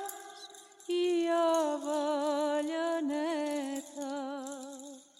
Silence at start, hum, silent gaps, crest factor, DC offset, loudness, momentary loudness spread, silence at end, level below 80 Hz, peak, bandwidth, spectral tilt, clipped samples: 0 s; none; none; 16 dB; under 0.1%; -32 LUFS; 18 LU; 0.15 s; -84 dBFS; -18 dBFS; 16 kHz; -2 dB/octave; under 0.1%